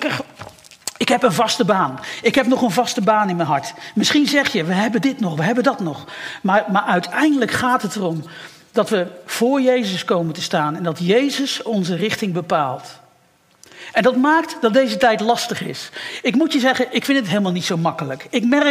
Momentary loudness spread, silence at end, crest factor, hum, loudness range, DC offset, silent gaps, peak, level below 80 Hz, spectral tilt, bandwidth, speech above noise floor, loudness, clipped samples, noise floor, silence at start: 10 LU; 0 s; 16 dB; none; 3 LU; under 0.1%; none; -2 dBFS; -62 dBFS; -4.5 dB/octave; 16 kHz; 38 dB; -18 LUFS; under 0.1%; -56 dBFS; 0 s